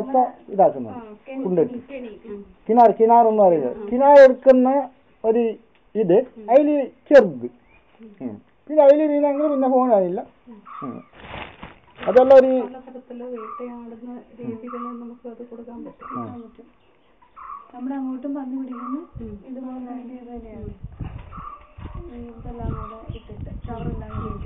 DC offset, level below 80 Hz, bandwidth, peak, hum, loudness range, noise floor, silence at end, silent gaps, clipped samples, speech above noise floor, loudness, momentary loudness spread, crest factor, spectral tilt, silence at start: 0.1%; -46 dBFS; 6.4 kHz; -4 dBFS; none; 20 LU; -57 dBFS; 0 s; none; under 0.1%; 37 dB; -17 LUFS; 24 LU; 16 dB; -6 dB/octave; 0 s